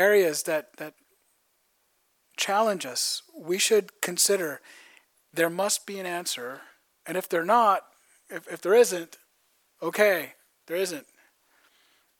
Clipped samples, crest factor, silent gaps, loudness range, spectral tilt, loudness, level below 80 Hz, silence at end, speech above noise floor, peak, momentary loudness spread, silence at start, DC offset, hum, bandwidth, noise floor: under 0.1%; 22 dB; none; 4 LU; -2 dB/octave; -25 LUFS; -88 dBFS; 1.2 s; 45 dB; -6 dBFS; 20 LU; 0 s; under 0.1%; none; 19 kHz; -71 dBFS